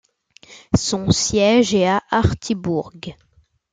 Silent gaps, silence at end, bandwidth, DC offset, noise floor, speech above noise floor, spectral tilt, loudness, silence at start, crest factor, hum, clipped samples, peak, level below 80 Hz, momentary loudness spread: none; 0.6 s; 9.6 kHz; under 0.1%; -49 dBFS; 31 dB; -4.5 dB/octave; -18 LUFS; 0.5 s; 18 dB; none; under 0.1%; -2 dBFS; -42 dBFS; 14 LU